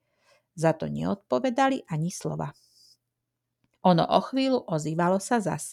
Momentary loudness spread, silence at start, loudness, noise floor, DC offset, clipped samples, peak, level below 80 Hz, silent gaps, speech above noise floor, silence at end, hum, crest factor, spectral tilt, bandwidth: 8 LU; 0.55 s; -26 LUFS; -83 dBFS; under 0.1%; under 0.1%; -6 dBFS; -64 dBFS; none; 58 dB; 0 s; none; 20 dB; -6 dB/octave; 13.5 kHz